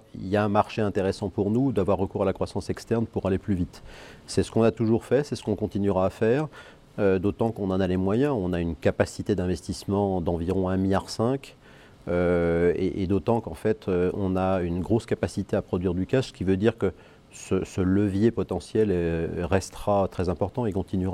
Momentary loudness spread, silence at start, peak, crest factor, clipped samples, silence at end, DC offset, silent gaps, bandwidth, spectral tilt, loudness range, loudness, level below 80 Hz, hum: 6 LU; 0.15 s; -6 dBFS; 20 dB; under 0.1%; 0 s; under 0.1%; none; 13 kHz; -7 dB/octave; 2 LU; -26 LUFS; -48 dBFS; none